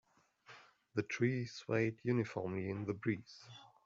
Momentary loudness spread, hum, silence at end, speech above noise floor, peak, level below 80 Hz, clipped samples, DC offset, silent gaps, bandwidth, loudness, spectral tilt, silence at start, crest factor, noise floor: 22 LU; none; 0.2 s; 26 dB; -22 dBFS; -76 dBFS; under 0.1%; under 0.1%; none; 7.6 kHz; -39 LUFS; -6.5 dB/octave; 0.5 s; 18 dB; -64 dBFS